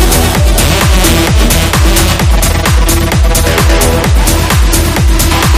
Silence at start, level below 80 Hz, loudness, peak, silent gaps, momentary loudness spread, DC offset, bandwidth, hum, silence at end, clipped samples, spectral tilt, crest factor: 0 s; -10 dBFS; -8 LUFS; 0 dBFS; none; 2 LU; under 0.1%; 16 kHz; none; 0 s; 0.3%; -4 dB/octave; 8 dB